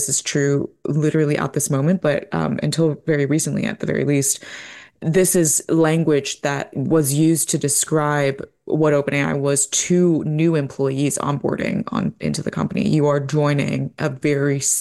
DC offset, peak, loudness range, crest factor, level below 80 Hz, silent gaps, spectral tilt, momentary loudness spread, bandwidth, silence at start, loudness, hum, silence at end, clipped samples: under 0.1%; -6 dBFS; 3 LU; 12 dB; -54 dBFS; none; -5 dB/octave; 7 LU; 12.5 kHz; 0 s; -19 LUFS; none; 0 s; under 0.1%